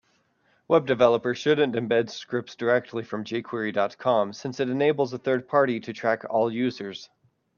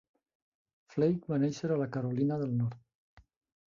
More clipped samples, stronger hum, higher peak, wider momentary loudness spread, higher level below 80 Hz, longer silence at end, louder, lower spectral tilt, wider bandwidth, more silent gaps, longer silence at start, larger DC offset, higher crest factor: neither; neither; first, -6 dBFS vs -16 dBFS; first, 10 LU vs 4 LU; about the same, -70 dBFS vs -70 dBFS; about the same, 0.55 s vs 0.5 s; first, -25 LUFS vs -32 LUFS; second, -6 dB/octave vs -8.5 dB/octave; about the same, 7.2 kHz vs 7.6 kHz; second, none vs 2.95-3.17 s; second, 0.7 s vs 0.9 s; neither; about the same, 18 dB vs 18 dB